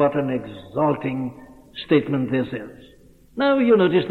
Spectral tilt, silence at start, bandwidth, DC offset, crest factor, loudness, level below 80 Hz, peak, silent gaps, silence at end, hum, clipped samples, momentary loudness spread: -8.5 dB/octave; 0 s; 4.5 kHz; under 0.1%; 16 dB; -21 LUFS; -56 dBFS; -4 dBFS; none; 0 s; none; under 0.1%; 19 LU